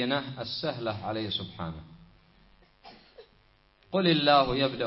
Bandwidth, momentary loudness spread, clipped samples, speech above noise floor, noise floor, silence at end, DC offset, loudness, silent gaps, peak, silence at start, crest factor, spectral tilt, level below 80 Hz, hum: 5.8 kHz; 16 LU; under 0.1%; 35 dB; -63 dBFS; 0 s; under 0.1%; -28 LUFS; none; -8 dBFS; 0 s; 22 dB; -9 dB/octave; -56 dBFS; none